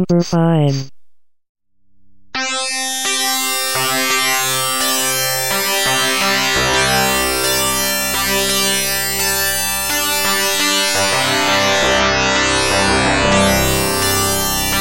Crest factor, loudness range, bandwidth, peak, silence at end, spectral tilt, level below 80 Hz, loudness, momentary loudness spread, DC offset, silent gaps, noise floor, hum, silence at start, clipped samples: 14 dB; 5 LU; 16.5 kHz; -2 dBFS; 0 s; -2.5 dB/octave; -36 dBFS; -14 LUFS; 3 LU; 1%; 1.49-1.55 s; -50 dBFS; none; 0 s; under 0.1%